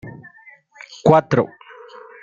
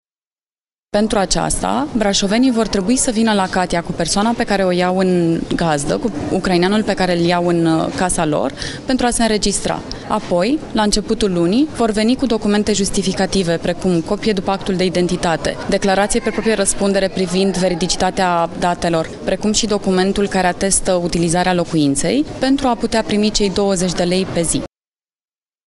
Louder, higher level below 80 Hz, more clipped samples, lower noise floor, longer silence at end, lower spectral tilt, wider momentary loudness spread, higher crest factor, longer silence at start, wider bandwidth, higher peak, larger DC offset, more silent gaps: about the same, -17 LUFS vs -16 LUFS; second, -54 dBFS vs -34 dBFS; neither; second, -48 dBFS vs under -90 dBFS; second, 0.75 s vs 1 s; first, -7.5 dB/octave vs -4.5 dB/octave; first, 26 LU vs 4 LU; about the same, 20 dB vs 16 dB; second, 0.05 s vs 0.95 s; second, 7.6 kHz vs 12 kHz; about the same, -2 dBFS vs 0 dBFS; neither; neither